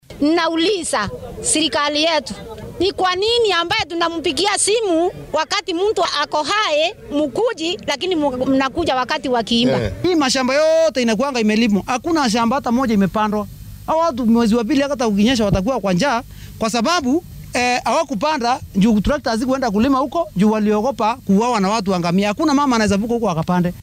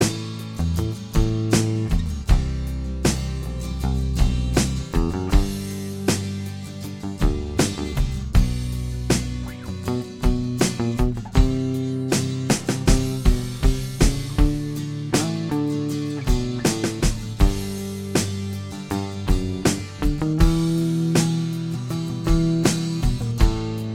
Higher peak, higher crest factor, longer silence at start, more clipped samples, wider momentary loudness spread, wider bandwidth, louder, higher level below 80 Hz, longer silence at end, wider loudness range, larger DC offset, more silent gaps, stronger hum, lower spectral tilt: about the same, -2 dBFS vs -2 dBFS; second, 14 dB vs 20 dB; about the same, 0.1 s vs 0 s; neither; about the same, 6 LU vs 8 LU; about the same, 15.5 kHz vs 16.5 kHz; first, -17 LUFS vs -24 LUFS; second, -40 dBFS vs -26 dBFS; about the same, 0 s vs 0 s; about the same, 2 LU vs 3 LU; neither; neither; neither; about the same, -4.5 dB/octave vs -5.5 dB/octave